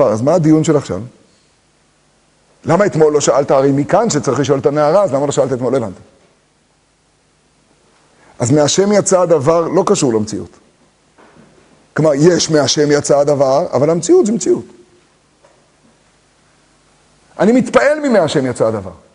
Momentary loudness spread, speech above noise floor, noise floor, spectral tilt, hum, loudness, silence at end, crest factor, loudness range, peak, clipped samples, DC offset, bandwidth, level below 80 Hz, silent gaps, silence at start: 8 LU; 44 dB; -56 dBFS; -5 dB/octave; none; -13 LUFS; 0.2 s; 14 dB; 7 LU; 0 dBFS; under 0.1%; under 0.1%; 10.5 kHz; -52 dBFS; none; 0 s